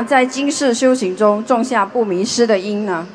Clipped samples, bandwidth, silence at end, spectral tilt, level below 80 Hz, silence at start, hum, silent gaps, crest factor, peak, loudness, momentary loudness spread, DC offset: under 0.1%; 10.5 kHz; 0 s; -4 dB/octave; -66 dBFS; 0 s; none; none; 16 dB; 0 dBFS; -16 LUFS; 3 LU; under 0.1%